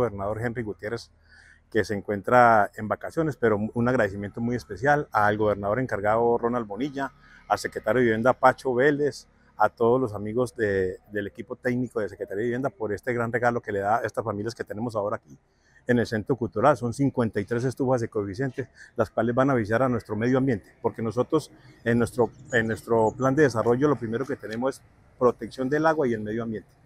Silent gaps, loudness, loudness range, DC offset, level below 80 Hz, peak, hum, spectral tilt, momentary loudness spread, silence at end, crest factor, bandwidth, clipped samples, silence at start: none; -25 LUFS; 4 LU; under 0.1%; -56 dBFS; -2 dBFS; none; -7 dB/octave; 10 LU; 0.25 s; 22 dB; 15 kHz; under 0.1%; 0 s